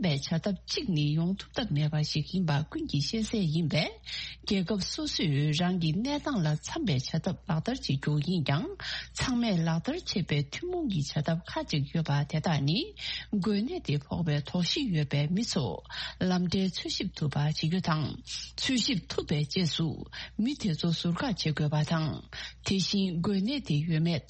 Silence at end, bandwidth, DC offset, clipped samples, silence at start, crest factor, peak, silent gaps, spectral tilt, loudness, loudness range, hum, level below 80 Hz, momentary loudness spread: 0.05 s; 8.4 kHz; under 0.1%; under 0.1%; 0 s; 18 dB; -12 dBFS; none; -5.5 dB/octave; -30 LUFS; 1 LU; none; -52 dBFS; 5 LU